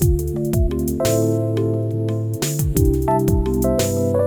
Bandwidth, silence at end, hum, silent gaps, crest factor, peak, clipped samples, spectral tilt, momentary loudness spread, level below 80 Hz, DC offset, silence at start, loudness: over 20 kHz; 0 s; none; none; 14 dB; -4 dBFS; under 0.1%; -6.5 dB/octave; 4 LU; -26 dBFS; under 0.1%; 0 s; -20 LUFS